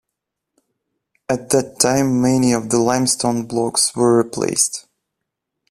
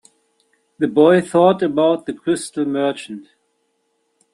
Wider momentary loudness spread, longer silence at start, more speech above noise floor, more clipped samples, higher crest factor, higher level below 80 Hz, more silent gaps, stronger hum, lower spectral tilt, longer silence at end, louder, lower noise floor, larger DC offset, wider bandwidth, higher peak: second, 6 LU vs 13 LU; first, 1.3 s vs 0.8 s; first, 63 dB vs 51 dB; neither; about the same, 18 dB vs 16 dB; first, -54 dBFS vs -64 dBFS; neither; neither; second, -4 dB/octave vs -6 dB/octave; second, 0.9 s vs 1.1 s; about the same, -17 LUFS vs -17 LUFS; first, -80 dBFS vs -68 dBFS; neither; first, 15 kHz vs 12 kHz; about the same, 0 dBFS vs -2 dBFS